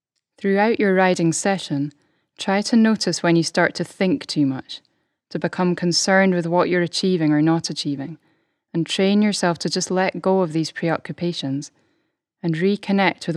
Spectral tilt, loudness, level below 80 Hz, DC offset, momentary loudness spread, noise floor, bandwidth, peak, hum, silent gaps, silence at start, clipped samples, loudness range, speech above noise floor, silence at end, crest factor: -5 dB/octave; -20 LUFS; -70 dBFS; under 0.1%; 11 LU; -71 dBFS; 12 kHz; -2 dBFS; none; none; 0.4 s; under 0.1%; 3 LU; 51 dB; 0 s; 18 dB